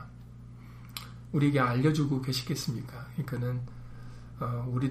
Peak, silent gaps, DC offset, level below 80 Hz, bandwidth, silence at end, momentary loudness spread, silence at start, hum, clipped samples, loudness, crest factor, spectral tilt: -14 dBFS; none; under 0.1%; -54 dBFS; 15.5 kHz; 0 s; 22 LU; 0 s; 60 Hz at -50 dBFS; under 0.1%; -31 LUFS; 18 dB; -6.5 dB/octave